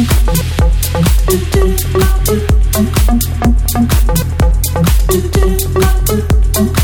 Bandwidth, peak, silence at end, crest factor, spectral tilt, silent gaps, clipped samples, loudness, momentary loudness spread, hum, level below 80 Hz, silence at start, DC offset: over 20 kHz; -2 dBFS; 0 s; 8 dB; -5.5 dB/octave; none; under 0.1%; -12 LUFS; 1 LU; none; -12 dBFS; 0 s; under 0.1%